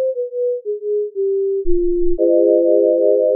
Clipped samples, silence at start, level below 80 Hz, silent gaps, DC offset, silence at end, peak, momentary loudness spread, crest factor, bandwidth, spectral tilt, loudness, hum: under 0.1%; 0 s; -30 dBFS; none; under 0.1%; 0 s; -4 dBFS; 8 LU; 12 dB; 0.7 kHz; -5.5 dB/octave; -17 LUFS; none